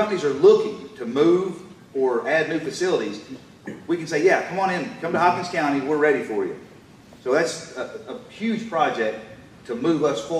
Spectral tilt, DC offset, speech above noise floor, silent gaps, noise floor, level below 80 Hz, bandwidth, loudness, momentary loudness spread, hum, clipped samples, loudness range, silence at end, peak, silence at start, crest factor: -5 dB/octave; under 0.1%; 25 dB; none; -47 dBFS; -64 dBFS; 12.5 kHz; -22 LUFS; 18 LU; none; under 0.1%; 5 LU; 0 s; -6 dBFS; 0 s; 18 dB